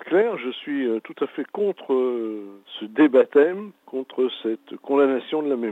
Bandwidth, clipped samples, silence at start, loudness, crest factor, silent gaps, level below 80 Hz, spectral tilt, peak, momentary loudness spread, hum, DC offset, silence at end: 4 kHz; under 0.1%; 0 s; -23 LUFS; 16 dB; none; under -90 dBFS; -7 dB/octave; -6 dBFS; 16 LU; none; under 0.1%; 0 s